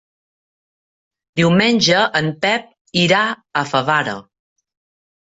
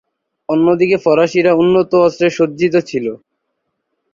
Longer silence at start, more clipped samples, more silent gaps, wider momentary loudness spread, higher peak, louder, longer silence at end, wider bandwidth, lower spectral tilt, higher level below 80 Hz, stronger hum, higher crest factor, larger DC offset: first, 1.35 s vs 0.5 s; neither; first, 2.81-2.85 s vs none; about the same, 9 LU vs 10 LU; about the same, -2 dBFS vs -2 dBFS; second, -16 LUFS vs -13 LUFS; about the same, 1 s vs 1 s; about the same, 8 kHz vs 7.4 kHz; second, -4.5 dB/octave vs -6.5 dB/octave; about the same, -58 dBFS vs -56 dBFS; neither; first, 18 dB vs 12 dB; neither